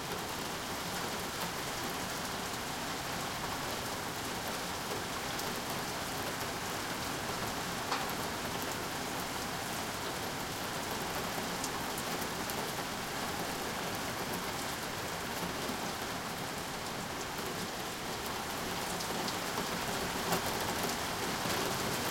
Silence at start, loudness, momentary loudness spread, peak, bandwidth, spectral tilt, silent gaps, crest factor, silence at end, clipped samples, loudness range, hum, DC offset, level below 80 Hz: 0 s; -36 LUFS; 4 LU; -18 dBFS; 17 kHz; -3 dB/octave; none; 20 dB; 0 s; under 0.1%; 2 LU; none; under 0.1%; -58 dBFS